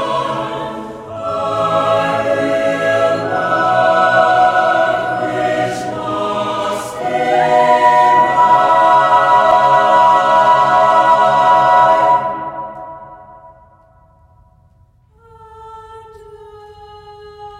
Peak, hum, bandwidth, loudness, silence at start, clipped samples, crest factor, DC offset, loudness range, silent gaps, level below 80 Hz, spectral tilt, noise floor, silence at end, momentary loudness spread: 0 dBFS; none; 12.5 kHz; -12 LUFS; 0 s; under 0.1%; 14 dB; under 0.1%; 7 LU; none; -52 dBFS; -4.5 dB/octave; -50 dBFS; 0 s; 12 LU